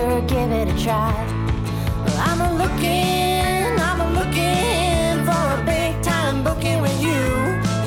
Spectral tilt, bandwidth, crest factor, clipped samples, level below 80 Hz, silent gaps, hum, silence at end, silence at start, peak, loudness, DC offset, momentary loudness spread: -5.5 dB/octave; 17.5 kHz; 12 dB; under 0.1%; -28 dBFS; none; none; 0 s; 0 s; -6 dBFS; -20 LUFS; under 0.1%; 3 LU